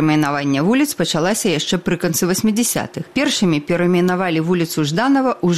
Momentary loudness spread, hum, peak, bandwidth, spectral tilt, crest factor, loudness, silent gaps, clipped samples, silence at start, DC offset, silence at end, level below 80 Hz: 3 LU; none; -4 dBFS; 15.5 kHz; -4.5 dB/octave; 12 dB; -17 LUFS; none; under 0.1%; 0 s; 0.2%; 0 s; -52 dBFS